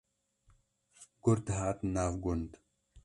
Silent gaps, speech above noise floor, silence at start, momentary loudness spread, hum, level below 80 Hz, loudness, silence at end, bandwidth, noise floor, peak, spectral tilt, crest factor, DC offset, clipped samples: none; 38 dB; 1 s; 7 LU; none; -50 dBFS; -34 LUFS; 0.05 s; 11.5 kHz; -70 dBFS; -16 dBFS; -7 dB/octave; 20 dB; under 0.1%; under 0.1%